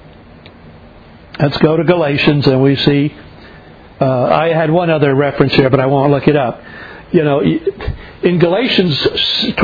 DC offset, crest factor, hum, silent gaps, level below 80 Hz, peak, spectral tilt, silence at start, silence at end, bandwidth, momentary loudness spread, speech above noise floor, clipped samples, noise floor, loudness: under 0.1%; 14 dB; none; none; -38 dBFS; 0 dBFS; -8 dB/octave; 0.45 s; 0 s; 5 kHz; 9 LU; 26 dB; 0.1%; -38 dBFS; -13 LUFS